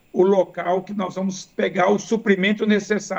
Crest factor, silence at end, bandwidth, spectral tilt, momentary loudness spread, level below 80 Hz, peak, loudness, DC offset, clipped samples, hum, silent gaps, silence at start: 16 dB; 0 s; 8.2 kHz; -5.5 dB/octave; 8 LU; -66 dBFS; -4 dBFS; -21 LUFS; under 0.1%; under 0.1%; none; none; 0.15 s